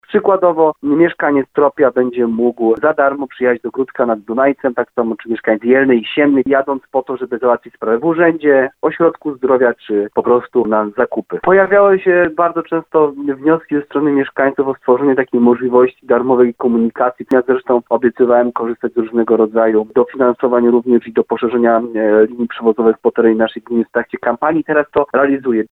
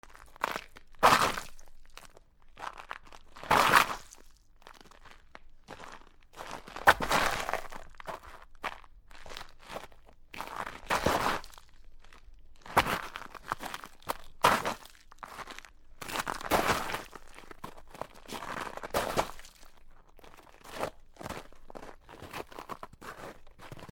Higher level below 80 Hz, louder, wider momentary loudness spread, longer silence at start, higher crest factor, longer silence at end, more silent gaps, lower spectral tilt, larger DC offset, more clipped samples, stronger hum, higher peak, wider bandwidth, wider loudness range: about the same, -56 dBFS vs -52 dBFS; first, -14 LUFS vs -31 LUFS; second, 6 LU vs 25 LU; about the same, 0.1 s vs 0.05 s; second, 14 dB vs 30 dB; about the same, 0.05 s vs 0 s; neither; first, -9 dB/octave vs -2.5 dB/octave; neither; neither; neither; first, 0 dBFS vs -4 dBFS; second, 4 kHz vs 19 kHz; second, 2 LU vs 13 LU